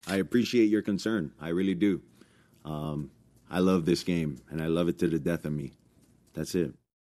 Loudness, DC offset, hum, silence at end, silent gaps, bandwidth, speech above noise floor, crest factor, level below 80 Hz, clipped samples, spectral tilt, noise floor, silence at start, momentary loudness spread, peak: -29 LUFS; under 0.1%; none; 0.3 s; none; 13.5 kHz; 34 dB; 16 dB; -56 dBFS; under 0.1%; -6.5 dB/octave; -62 dBFS; 0.05 s; 13 LU; -12 dBFS